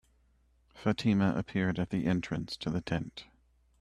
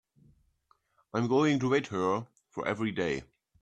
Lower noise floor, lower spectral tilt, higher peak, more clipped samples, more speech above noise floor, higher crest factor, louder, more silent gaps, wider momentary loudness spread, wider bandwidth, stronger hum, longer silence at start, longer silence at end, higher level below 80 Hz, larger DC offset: about the same, -68 dBFS vs -71 dBFS; about the same, -7 dB/octave vs -6 dB/octave; second, -16 dBFS vs -12 dBFS; neither; second, 37 dB vs 42 dB; about the same, 18 dB vs 20 dB; about the same, -32 LUFS vs -30 LUFS; neither; second, 8 LU vs 11 LU; first, 11 kHz vs 9.4 kHz; neither; second, 0.75 s vs 1.15 s; first, 0.55 s vs 0.4 s; first, -58 dBFS vs -66 dBFS; neither